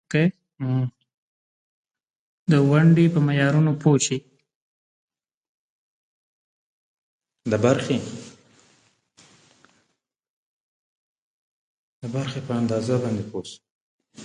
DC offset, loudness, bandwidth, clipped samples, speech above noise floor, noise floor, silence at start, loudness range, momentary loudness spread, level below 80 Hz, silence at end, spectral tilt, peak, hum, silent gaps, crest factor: under 0.1%; -22 LUFS; 10 kHz; under 0.1%; 54 dB; -75 dBFS; 0.1 s; 14 LU; 17 LU; -62 dBFS; 0 s; -6.5 dB/octave; -4 dBFS; none; 1.14-1.85 s, 2.10-2.46 s, 4.55-5.08 s, 5.34-7.20 s, 10.29-12.02 s, 13.70-13.99 s; 20 dB